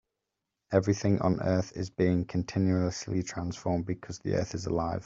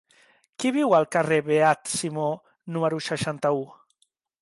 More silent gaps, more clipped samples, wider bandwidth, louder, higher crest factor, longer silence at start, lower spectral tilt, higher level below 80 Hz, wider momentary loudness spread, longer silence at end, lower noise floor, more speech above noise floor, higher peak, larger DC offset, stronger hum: neither; neither; second, 7.8 kHz vs 11.5 kHz; second, -30 LUFS vs -24 LUFS; about the same, 22 dB vs 18 dB; about the same, 0.7 s vs 0.6 s; first, -6.5 dB/octave vs -5 dB/octave; first, -56 dBFS vs -68 dBFS; about the same, 7 LU vs 9 LU; second, 0.05 s vs 0.7 s; first, -86 dBFS vs -70 dBFS; first, 57 dB vs 47 dB; about the same, -8 dBFS vs -8 dBFS; neither; neither